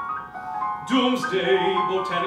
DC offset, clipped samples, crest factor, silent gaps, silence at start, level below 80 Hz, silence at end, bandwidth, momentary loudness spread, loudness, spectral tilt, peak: under 0.1%; under 0.1%; 16 dB; none; 0 s; -62 dBFS; 0 s; 13.5 kHz; 10 LU; -23 LUFS; -4.5 dB/octave; -8 dBFS